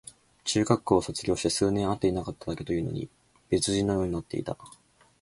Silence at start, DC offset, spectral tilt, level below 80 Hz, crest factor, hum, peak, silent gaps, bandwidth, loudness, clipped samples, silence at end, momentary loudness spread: 0.05 s; under 0.1%; -5 dB/octave; -50 dBFS; 22 dB; none; -6 dBFS; none; 11.5 kHz; -28 LUFS; under 0.1%; 0.55 s; 12 LU